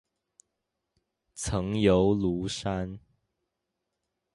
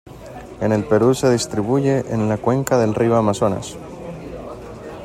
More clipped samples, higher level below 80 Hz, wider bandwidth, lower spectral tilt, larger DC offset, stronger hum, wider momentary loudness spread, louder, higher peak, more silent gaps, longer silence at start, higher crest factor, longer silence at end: neither; about the same, -48 dBFS vs -46 dBFS; second, 11.5 kHz vs 16 kHz; about the same, -6 dB/octave vs -6.5 dB/octave; neither; neither; about the same, 17 LU vs 18 LU; second, -27 LUFS vs -18 LUFS; second, -10 dBFS vs -2 dBFS; neither; first, 1.35 s vs 0.05 s; about the same, 20 dB vs 16 dB; first, 1.35 s vs 0 s